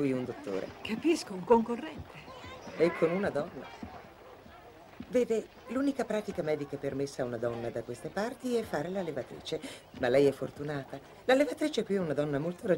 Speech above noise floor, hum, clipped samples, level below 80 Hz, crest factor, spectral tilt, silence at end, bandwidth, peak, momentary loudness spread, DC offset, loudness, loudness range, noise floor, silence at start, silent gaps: 21 dB; none; under 0.1%; -62 dBFS; 20 dB; -6 dB/octave; 0 s; 16 kHz; -12 dBFS; 19 LU; under 0.1%; -32 LUFS; 4 LU; -52 dBFS; 0 s; none